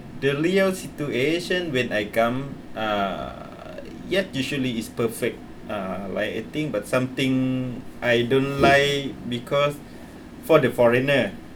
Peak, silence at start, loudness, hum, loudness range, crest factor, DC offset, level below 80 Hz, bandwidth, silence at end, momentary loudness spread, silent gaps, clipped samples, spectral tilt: -4 dBFS; 0 s; -23 LUFS; none; 6 LU; 20 dB; under 0.1%; -50 dBFS; 20 kHz; 0 s; 16 LU; none; under 0.1%; -5.5 dB/octave